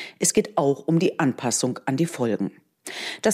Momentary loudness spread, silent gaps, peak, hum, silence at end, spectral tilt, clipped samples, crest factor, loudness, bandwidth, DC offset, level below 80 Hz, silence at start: 11 LU; none; -8 dBFS; none; 0 s; -4.5 dB/octave; under 0.1%; 16 dB; -24 LUFS; 16 kHz; under 0.1%; -64 dBFS; 0 s